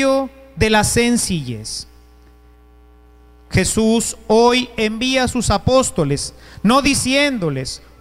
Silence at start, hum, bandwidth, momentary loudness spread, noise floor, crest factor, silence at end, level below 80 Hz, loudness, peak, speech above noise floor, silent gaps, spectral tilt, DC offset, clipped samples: 0 s; 60 Hz at -45 dBFS; 16 kHz; 12 LU; -46 dBFS; 14 dB; 0.25 s; -36 dBFS; -17 LUFS; -4 dBFS; 30 dB; none; -4 dB/octave; under 0.1%; under 0.1%